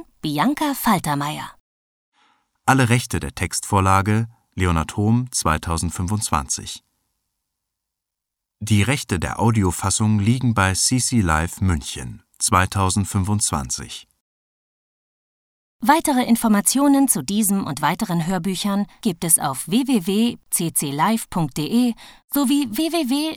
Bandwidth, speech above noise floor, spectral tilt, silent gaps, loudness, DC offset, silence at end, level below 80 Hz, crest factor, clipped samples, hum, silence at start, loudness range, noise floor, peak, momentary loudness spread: 18.5 kHz; 63 dB; -4.5 dB/octave; 1.60-2.12 s, 14.20-15.79 s, 22.24-22.28 s; -20 LUFS; under 0.1%; 0 s; -40 dBFS; 18 dB; under 0.1%; none; 0.25 s; 5 LU; -83 dBFS; -2 dBFS; 9 LU